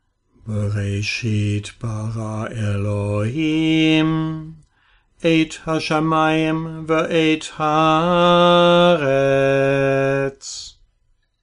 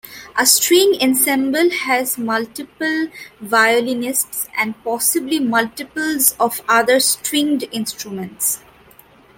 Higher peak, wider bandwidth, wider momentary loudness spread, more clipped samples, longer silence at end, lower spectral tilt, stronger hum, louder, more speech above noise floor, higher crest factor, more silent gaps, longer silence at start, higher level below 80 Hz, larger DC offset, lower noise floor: second, -4 dBFS vs 0 dBFS; second, 10.5 kHz vs 17 kHz; about the same, 13 LU vs 11 LU; neither; about the same, 0.75 s vs 0.8 s; first, -6 dB/octave vs -1.5 dB/octave; neither; about the same, -18 LUFS vs -16 LUFS; first, 45 dB vs 30 dB; about the same, 16 dB vs 18 dB; neither; first, 0.45 s vs 0.05 s; first, -48 dBFS vs -60 dBFS; neither; first, -63 dBFS vs -47 dBFS